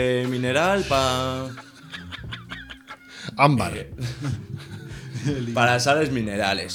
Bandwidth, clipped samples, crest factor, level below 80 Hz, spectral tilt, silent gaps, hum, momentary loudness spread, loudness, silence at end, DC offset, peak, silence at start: 18 kHz; under 0.1%; 22 dB; -48 dBFS; -5 dB/octave; none; none; 18 LU; -23 LUFS; 0 s; under 0.1%; -2 dBFS; 0 s